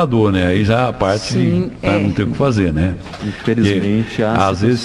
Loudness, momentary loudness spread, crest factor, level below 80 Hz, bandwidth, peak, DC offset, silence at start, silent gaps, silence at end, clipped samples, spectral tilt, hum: -16 LUFS; 5 LU; 14 dB; -32 dBFS; 11.5 kHz; 0 dBFS; under 0.1%; 0 s; none; 0 s; under 0.1%; -7 dB/octave; none